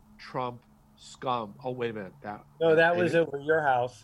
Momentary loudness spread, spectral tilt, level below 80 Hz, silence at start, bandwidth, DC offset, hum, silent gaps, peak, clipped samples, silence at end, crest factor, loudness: 17 LU; -6 dB/octave; -66 dBFS; 0.2 s; 11.5 kHz; under 0.1%; none; none; -10 dBFS; under 0.1%; 0.05 s; 18 dB; -27 LUFS